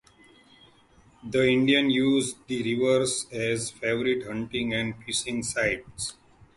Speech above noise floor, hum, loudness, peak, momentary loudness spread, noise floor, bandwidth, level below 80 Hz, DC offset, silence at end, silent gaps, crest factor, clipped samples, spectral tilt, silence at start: 32 dB; none; -26 LUFS; -8 dBFS; 10 LU; -58 dBFS; 11.5 kHz; -56 dBFS; under 0.1%; 0.45 s; none; 18 dB; under 0.1%; -4 dB/octave; 1.25 s